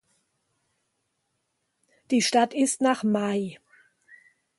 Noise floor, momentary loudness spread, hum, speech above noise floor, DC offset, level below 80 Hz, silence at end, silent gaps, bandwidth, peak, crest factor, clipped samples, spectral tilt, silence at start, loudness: -77 dBFS; 7 LU; none; 53 dB; under 0.1%; -76 dBFS; 1.05 s; none; 12 kHz; -8 dBFS; 20 dB; under 0.1%; -3.5 dB/octave; 2.1 s; -24 LUFS